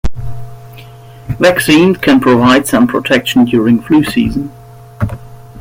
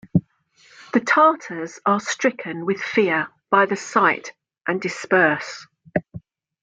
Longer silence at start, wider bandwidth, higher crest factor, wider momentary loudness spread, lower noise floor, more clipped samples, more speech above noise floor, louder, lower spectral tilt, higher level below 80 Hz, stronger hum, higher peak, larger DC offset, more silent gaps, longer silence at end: about the same, 0.05 s vs 0.15 s; first, 16.5 kHz vs 9.4 kHz; second, 12 dB vs 18 dB; first, 19 LU vs 11 LU; second, -33 dBFS vs -57 dBFS; neither; second, 24 dB vs 36 dB; first, -10 LUFS vs -21 LUFS; about the same, -5.5 dB/octave vs -5 dB/octave; first, -32 dBFS vs -58 dBFS; neither; about the same, 0 dBFS vs -2 dBFS; neither; neither; second, 0 s vs 0.45 s